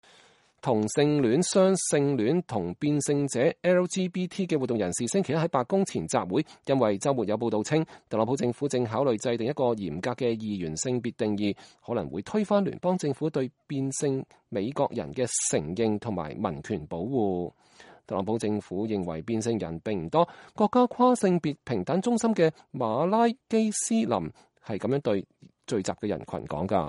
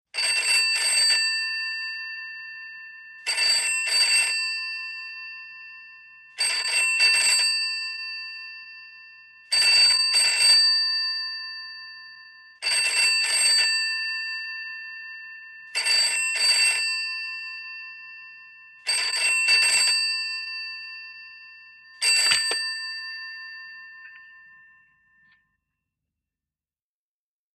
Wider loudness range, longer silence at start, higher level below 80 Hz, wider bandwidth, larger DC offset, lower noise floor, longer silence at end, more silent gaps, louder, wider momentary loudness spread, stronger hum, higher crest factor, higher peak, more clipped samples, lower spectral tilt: about the same, 5 LU vs 6 LU; first, 0.65 s vs 0.15 s; first, -60 dBFS vs -76 dBFS; second, 11.5 kHz vs 15.5 kHz; neither; second, -60 dBFS vs under -90 dBFS; second, 0 s vs 3.2 s; neither; second, -27 LUFS vs -20 LUFS; second, 9 LU vs 22 LU; neither; about the same, 18 dB vs 20 dB; about the same, -8 dBFS vs -6 dBFS; neither; first, -5.5 dB/octave vs 4 dB/octave